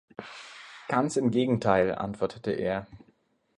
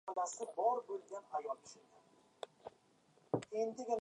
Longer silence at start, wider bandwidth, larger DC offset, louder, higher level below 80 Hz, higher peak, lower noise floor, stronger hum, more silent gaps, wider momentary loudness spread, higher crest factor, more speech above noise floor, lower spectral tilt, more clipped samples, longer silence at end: first, 0.2 s vs 0.05 s; about the same, 10.5 kHz vs 11 kHz; neither; first, -28 LUFS vs -41 LUFS; first, -58 dBFS vs -86 dBFS; first, -8 dBFS vs -20 dBFS; second, -67 dBFS vs -71 dBFS; neither; neither; about the same, 19 LU vs 21 LU; about the same, 20 dB vs 22 dB; first, 40 dB vs 30 dB; about the same, -6 dB/octave vs -5 dB/octave; neither; first, 0.6 s vs 0 s